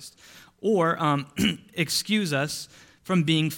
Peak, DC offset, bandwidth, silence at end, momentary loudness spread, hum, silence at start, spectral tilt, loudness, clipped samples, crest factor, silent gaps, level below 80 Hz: -10 dBFS; under 0.1%; 17.5 kHz; 0 s; 13 LU; none; 0 s; -4.5 dB/octave; -25 LUFS; under 0.1%; 16 dB; none; -58 dBFS